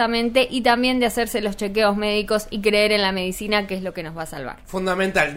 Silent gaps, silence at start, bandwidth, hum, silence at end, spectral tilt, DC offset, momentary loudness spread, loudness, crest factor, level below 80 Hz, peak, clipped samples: none; 0 s; 16 kHz; none; 0 s; -4 dB/octave; under 0.1%; 12 LU; -21 LUFS; 16 dB; -42 dBFS; -4 dBFS; under 0.1%